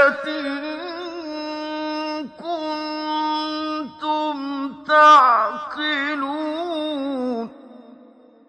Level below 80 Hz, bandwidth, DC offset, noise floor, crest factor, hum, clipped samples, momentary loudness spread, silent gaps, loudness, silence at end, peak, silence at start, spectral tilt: -70 dBFS; 10 kHz; under 0.1%; -49 dBFS; 18 dB; none; under 0.1%; 16 LU; none; -21 LUFS; 0.55 s; -2 dBFS; 0 s; -3 dB/octave